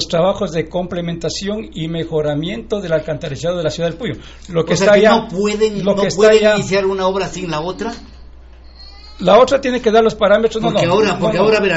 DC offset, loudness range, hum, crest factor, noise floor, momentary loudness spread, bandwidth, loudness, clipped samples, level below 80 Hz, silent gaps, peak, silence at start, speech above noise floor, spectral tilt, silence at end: under 0.1%; 7 LU; none; 14 dB; -38 dBFS; 13 LU; 8.2 kHz; -15 LUFS; under 0.1%; -38 dBFS; none; 0 dBFS; 0 s; 23 dB; -5 dB/octave; 0 s